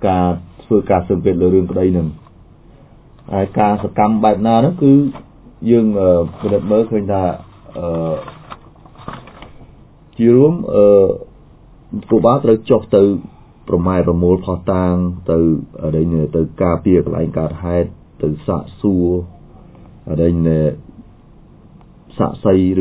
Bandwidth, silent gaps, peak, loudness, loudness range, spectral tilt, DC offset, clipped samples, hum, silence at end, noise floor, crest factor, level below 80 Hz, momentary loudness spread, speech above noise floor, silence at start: 4 kHz; none; 0 dBFS; -15 LUFS; 6 LU; -13 dB/octave; under 0.1%; under 0.1%; none; 0 s; -43 dBFS; 16 dB; -34 dBFS; 14 LU; 29 dB; 0 s